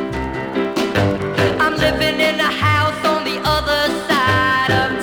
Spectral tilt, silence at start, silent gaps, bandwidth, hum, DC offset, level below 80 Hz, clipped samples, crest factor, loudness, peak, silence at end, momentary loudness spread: -5 dB/octave; 0 s; none; over 20 kHz; none; under 0.1%; -36 dBFS; under 0.1%; 14 dB; -17 LUFS; -2 dBFS; 0 s; 5 LU